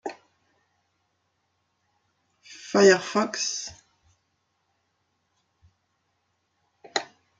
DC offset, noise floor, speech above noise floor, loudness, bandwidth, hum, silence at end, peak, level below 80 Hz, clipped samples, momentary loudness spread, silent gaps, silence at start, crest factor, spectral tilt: under 0.1%; -74 dBFS; 53 dB; -23 LUFS; 9.2 kHz; none; 0.35 s; -6 dBFS; -74 dBFS; under 0.1%; 21 LU; none; 0.05 s; 24 dB; -3 dB/octave